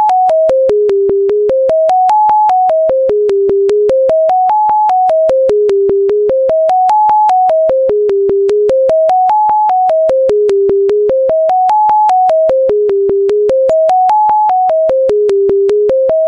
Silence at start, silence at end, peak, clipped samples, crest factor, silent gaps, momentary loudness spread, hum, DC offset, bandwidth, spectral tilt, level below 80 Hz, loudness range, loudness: 0 s; 0 s; -2 dBFS; under 0.1%; 8 dB; none; 2 LU; none; under 0.1%; 8.2 kHz; -6.5 dB/octave; -46 dBFS; 0 LU; -10 LUFS